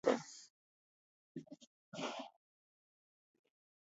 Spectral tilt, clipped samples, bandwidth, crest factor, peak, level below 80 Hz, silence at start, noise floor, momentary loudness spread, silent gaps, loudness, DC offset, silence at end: -3 dB/octave; under 0.1%; 7.6 kHz; 28 dB; -18 dBFS; under -90 dBFS; 0.05 s; under -90 dBFS; 19 LU; 0.50-1.35 s, 1.67-1.92 s; -46 LUFS; under 0.1%; 1.65 s